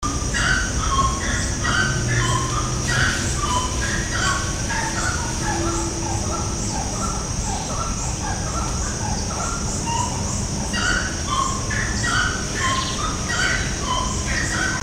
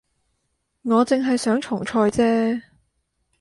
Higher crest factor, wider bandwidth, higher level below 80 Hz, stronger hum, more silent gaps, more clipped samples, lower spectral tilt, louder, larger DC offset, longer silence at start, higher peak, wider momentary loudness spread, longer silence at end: about the same, 16 dB vs 16 dB; first, 16 kHz vs 11.5 kHz; first, -30 dBFS vs -56 dBFS; neither; neither; neither; second, -3 dB/octave vs -5.5 dB/octave; about the same, -22 LUFS vs -21 LUFS; neither; second, 0 s vs 0.85 s; about the same, -6 dBFS vs -6 dBFS; about the same, 4 LU vs 6 LU; second, 0 s vs 0.8 s